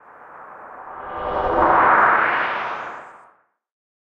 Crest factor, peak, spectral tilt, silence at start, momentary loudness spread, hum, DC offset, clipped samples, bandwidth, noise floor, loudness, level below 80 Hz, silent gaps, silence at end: 18 dB; -4 dBFS; -6 dB/octave; 0.2 s; 24 LU; none; under 0.1%; under 0.1%; 7.6 kHz; -57 dBFS; -18 LUFS; -46 dBFS; none; 0.9 s